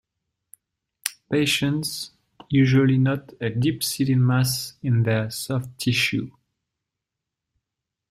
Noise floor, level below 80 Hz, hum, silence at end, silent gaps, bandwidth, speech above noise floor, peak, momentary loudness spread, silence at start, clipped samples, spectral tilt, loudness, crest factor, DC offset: -85 dBFS; -58 dBFS; none; 1.8 s; none; 16 kHz; 63 dB; 0 dBFS; 12 LU; 1.05 s; under 0.1%; -5 dB/octave; -23 LUFS; 24 dB; under 0.1%